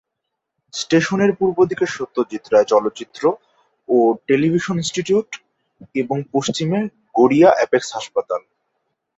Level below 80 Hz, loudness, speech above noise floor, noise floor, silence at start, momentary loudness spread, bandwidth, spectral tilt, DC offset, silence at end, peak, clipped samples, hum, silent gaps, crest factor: -60 dBFS; -18 LUFS; 61 dB; -78 dBFS; 0.75 s; 13 LU; 8 kHz; -5.5 dB/octave; under 0.1%; 0.8 s; -2 dBFS; under 0.1%; none; none; 18 dB